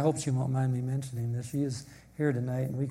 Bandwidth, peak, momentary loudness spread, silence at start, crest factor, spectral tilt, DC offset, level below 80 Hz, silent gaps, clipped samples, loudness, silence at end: 14 kHz; -14 dBFS; 5 LU; 0 s; 18 dB; -7 dB/octave; under 0.1%; -62 dBFS; none; under 0.1%; -32 LUFS; 0 s